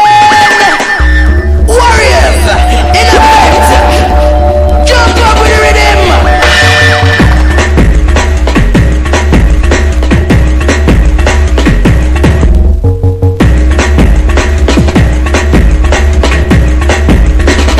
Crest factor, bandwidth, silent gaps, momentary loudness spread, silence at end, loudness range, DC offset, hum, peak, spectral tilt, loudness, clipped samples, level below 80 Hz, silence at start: 4 dB; 14.5 kHz; none; 5 LU; 0 s; 3 LU; under 0.1%; none; 0 dBFS; -5 dB/octave; -6 LUFS; 3%; -8 dBFS; 0 s